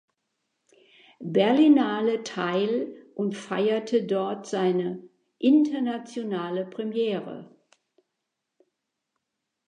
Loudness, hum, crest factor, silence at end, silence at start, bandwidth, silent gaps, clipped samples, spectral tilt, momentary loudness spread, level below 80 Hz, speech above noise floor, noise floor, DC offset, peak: -25 LUFS; none; 18 dB; 2.2 s; 1.2 s; 9.6 kHz; none; under 0.1%; -6.5 dB/octave; 14 LU; -82 dBFS; 58 dB; -83 dBFS; under 0.1%; -8 dBFS